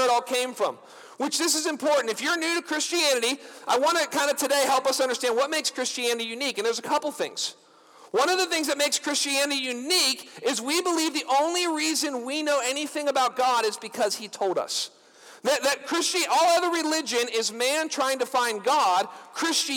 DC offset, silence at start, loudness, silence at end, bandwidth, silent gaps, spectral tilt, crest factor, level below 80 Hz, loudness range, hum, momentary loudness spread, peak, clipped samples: under 0.1%; 0 s; -25 LUFS; 0 s; over 20 kHz; none; -0.5 dB/octave; 16 dB; -84 dBFS; 3 LU; none; 7 LU; -10 dBFS; under 0.1%